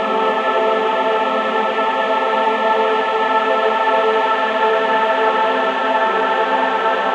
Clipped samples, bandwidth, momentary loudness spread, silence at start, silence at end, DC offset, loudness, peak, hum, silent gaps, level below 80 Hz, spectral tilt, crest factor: under 0.1%; 9 kHz; 2 LU; 0 s; 0 s; under 0.1%; -16 LUFS; -2 dBFS; none; none; -64 dBFS; -4 dB/octave; 14 dB